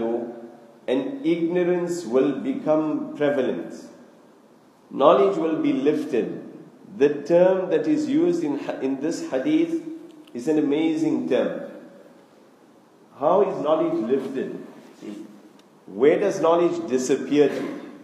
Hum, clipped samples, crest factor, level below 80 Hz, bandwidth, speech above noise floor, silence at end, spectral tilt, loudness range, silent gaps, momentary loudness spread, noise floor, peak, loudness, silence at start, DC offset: none; under 0.1%; 22 dB; -80 dBFS; 12 kHz; 32 dB; 0 s; -6 dB/octave; 4 LU; none; 19 LU; -53 dBFS; -2 dBFS; -22 LUFS; 0 s; under 0.1%